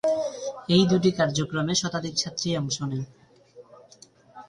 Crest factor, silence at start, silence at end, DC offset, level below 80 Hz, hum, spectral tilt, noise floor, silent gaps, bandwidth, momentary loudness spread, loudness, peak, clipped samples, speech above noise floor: 18 dB; 0.05 s; 0.05 s; under 0.1%; -60 dBFS; none; -4.5 dB/octave; -54 dBFS; none; 11 kHz; 11 LU; -25 LUFS; -8 dBFS; under 0.1%; 30 dB